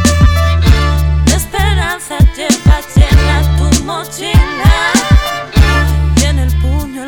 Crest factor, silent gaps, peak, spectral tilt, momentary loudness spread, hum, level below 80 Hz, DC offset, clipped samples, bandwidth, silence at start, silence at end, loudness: 10 dB; none; 0 dBFS; -5 dB/octave; 5 LU; none; -12 dBFS; under 0.1%; 1%; 17.5 kHz; 0 s; 0 s; -11 LUFS